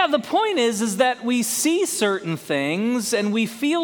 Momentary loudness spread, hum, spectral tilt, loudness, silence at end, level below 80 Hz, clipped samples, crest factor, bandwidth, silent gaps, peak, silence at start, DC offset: 3 LU; none; -3.5 dB/octave; -21 LUFS; 0 s; -68 dBFS; under 0.1%; 16 dB; 19 kHz; none; -4 dBFS; 0 s; under 0.1%